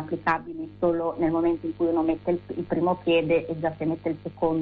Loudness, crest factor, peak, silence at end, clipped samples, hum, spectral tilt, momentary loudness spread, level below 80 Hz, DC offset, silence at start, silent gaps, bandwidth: -26 LUFS; 14 dB; -12 dBFS; 0 s; under 0.1%; none; -9 dB/octave; 7 LU; -54 dBFS; under 0.1%; 0 s; none; 4.8 kHz